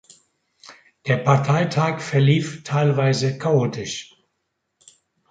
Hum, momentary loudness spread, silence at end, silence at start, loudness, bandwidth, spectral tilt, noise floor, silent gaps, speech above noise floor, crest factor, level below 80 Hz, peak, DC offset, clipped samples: none; 11 LU; 1.25 s; 0.7 s; -20 LUFS; 9 kHz; -6 dB/octave; -75 dBFS; none; 56 dB; 20 dB; -60 dBFS; -2 dBFS; under 0.1%; under 0.1%